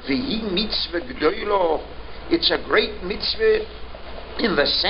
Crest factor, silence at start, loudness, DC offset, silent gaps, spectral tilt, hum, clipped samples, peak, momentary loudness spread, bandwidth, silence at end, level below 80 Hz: 18 dB; 0 s; -21 LUFS; under 0.1%; none; -8.5 dB/octave; none; under 0.1%; -4 dBFS; 17 LU; 5.8 kHz; 0 s; -40 dBFS